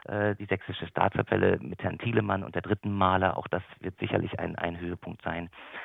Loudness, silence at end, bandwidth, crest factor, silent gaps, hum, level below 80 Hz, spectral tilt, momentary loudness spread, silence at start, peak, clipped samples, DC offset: -30 LUFS; 0 s; 4 kHz; 24 dB; none; none; -58 dBFS; -9.5 dB/octave; 11 LU; 0.1 s; -6 dBFS; under 0.1%; under 0.1%